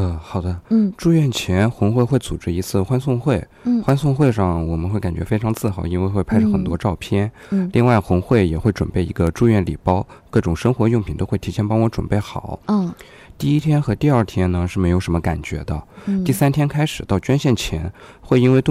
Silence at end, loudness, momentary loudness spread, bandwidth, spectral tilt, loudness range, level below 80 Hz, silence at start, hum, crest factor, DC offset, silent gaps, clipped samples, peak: 0 s; -19 LUFS; 8 LU; 15.5 kHz; -7.5 dB/octave; 2 LU; -36 dBFS; 0 s; none; 16 dB; under 0.1%; none; under 0.1%; -2 dBFS